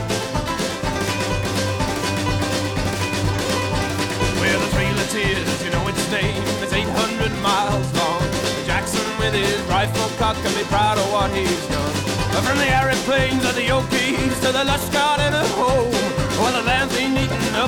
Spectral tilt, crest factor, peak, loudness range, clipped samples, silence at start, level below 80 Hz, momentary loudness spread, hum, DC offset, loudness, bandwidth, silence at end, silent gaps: -4 dB/octave; 12 dB; -8 dBFS; 3 LU; under 0.1%; 0 s; -34 dBFS; 4 LU; none; under 0.1%; -20 LUFS; 19 kHz; 0 s; none